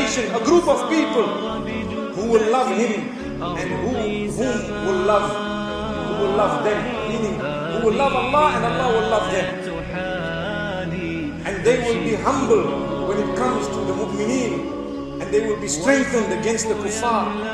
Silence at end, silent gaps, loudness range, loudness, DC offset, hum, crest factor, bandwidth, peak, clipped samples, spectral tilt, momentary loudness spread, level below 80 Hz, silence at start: 0 s; none; 3 LU; -21 LUFS; under 0.1%; none; 16 dB; 12.5 kHz; -4 dBFS; under 0.1%; -4.5 dB/octave; 9 LU; -42 dBFS; 0 s